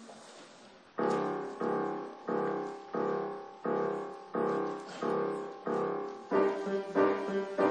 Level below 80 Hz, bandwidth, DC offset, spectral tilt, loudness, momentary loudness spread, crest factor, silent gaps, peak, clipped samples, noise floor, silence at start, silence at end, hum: -84 dBFS; 9.8 kHz; under 0.1%; -6.5 dB/octave; -34 LUFS; 10 LU; 20 dB; none; -14 dBFS; under 0.1%; -56 dBFS; 0 s; 0 s; none